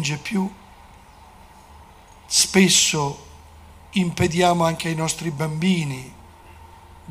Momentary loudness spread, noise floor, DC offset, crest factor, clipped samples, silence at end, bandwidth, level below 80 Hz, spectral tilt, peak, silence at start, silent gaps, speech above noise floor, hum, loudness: 15 LU; -47 dBFS; under 0.1%; 20 dB; under 0.1%; 0 s; 15.5 kHz; -48 dBFS; -3.5 dB/octave; -2 dBFS; 0 s; none; 26 dB; none; -20 LUFS